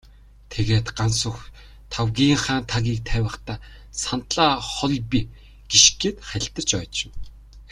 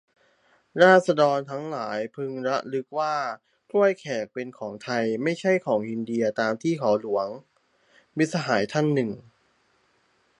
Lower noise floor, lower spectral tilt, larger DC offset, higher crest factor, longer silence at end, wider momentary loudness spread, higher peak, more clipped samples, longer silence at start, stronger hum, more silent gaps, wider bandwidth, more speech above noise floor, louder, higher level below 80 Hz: second, -45 dBFS vs -66 dBFS; second, -3 dB/octave vs -6 dB/octave; neither; about the same, 24 dB vs 22 dB; second, 0.05 s vs 1.2 s; first, 18 LU vs 14 LU; about the same, 0 dBFS vs -2 dBFS; neither; second, 0.5 s vs 0.75 s; first, 50 Hz at -45 dBFS vs none; neither; first, 12 kHz vs 10.5 kHz; second, 23 dB vs 42 dB; first, -21 LUFS vs -25 LUFS; first, -38 dBFS vs -72 dBFS